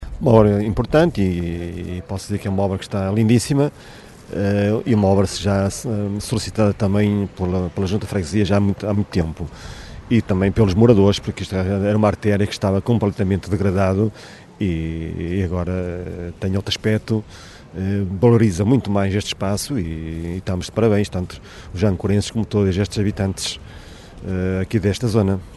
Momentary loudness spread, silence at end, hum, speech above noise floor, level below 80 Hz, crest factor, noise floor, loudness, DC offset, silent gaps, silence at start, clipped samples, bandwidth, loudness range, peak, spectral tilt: 12 LU; 0 s; none; 20 dB; -38 dBFS; 20 dB; -38 dBFS; -20 LUFS; under 0.1%; none; 0 s; under 0.1%; 12 kHz; 4 LU; 0 dBFS; -6.5 dB/octave